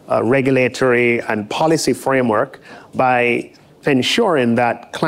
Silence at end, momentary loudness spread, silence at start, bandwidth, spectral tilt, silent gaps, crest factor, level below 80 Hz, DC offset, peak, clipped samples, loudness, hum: 0 s; 8 LU; 0.1 s; 16 kHz; -5 dB/octave; none; 12 dB; -56 dBFS; under 0.1%; -6 dBFS; under 0.1%; -16 LUFS; none